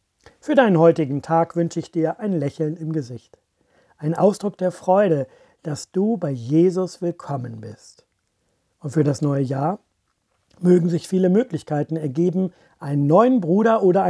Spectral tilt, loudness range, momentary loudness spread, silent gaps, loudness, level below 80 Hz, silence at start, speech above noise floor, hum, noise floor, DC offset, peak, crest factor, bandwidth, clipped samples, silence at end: -8 dB/octave; 5 LU; 15 LU; none; -20 LUFS; -68 dBFS; 0.45 s; 51 dB; none; -70 dBFS; under 0.1%; -2 dBFS; 18 dB; 11 kHz; under 0.1%; 0 s